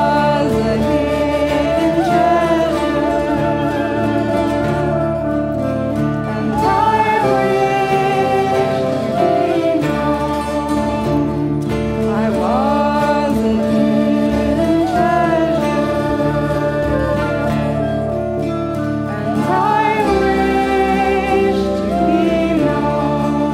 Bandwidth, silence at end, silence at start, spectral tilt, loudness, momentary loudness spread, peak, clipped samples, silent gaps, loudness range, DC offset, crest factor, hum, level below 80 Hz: 16 kHz; 0 s; 0 s; -7 dB/octave; -16 LUFS; 5 LU; -2 dBFS; under 0.1%; none; 2 LU; under 0.1%; 14 dB; none; -34 dBFS